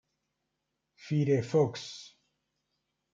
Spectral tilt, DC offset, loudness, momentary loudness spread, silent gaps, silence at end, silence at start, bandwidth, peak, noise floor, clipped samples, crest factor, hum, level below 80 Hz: -7 dB/octave; under 0.1%; -29 LUFS; 16 LU; none; 1.05 s; 1.05 s; 7.6 kHz; -14 dBFS; -83 dBFS; under 0.1%; 20 dB; none; -76 dBFS